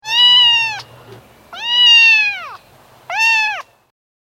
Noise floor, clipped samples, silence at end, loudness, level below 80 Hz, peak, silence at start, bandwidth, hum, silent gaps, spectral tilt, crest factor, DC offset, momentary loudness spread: -46 dBFS; under 0.1%; 0.75 s; -9 LUFS; -62 dBFS; -2 dBFS; 0.05 s; 15.5 kHz; none; none; 1.5 dB/octave; 14 dB; under 0.1%; 19 LU